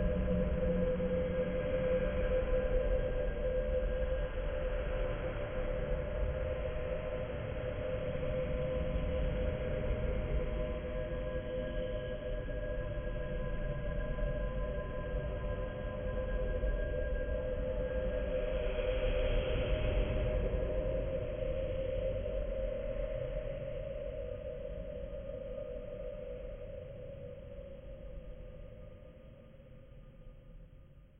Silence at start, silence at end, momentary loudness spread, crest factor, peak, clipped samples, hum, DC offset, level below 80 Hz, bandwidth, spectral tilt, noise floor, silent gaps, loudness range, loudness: 0 s; 0 s; 15 LU; 16 dB; -20 dBFS; under 0.1%; none; under 0.1%; -40 dBFS; 3.6 kHz; -10 dB/octave; -56 dBFS; none; 11 LU; -38 LUFS